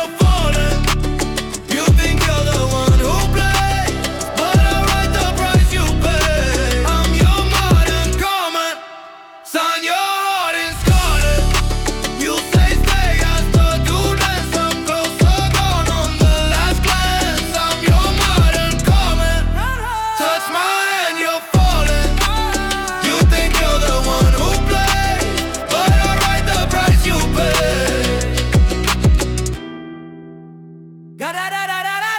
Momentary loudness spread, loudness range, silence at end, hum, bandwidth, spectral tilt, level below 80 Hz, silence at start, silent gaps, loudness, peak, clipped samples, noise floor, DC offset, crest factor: 7 LU; 2 LU; 0 s; none; 18 kHz; -4.5 dB/octave; -18 dBFS; 0 s; none; -16 LUFS; -4 dBFS; under 0.1%; -37 dBFS; under 0.1%; 12 dB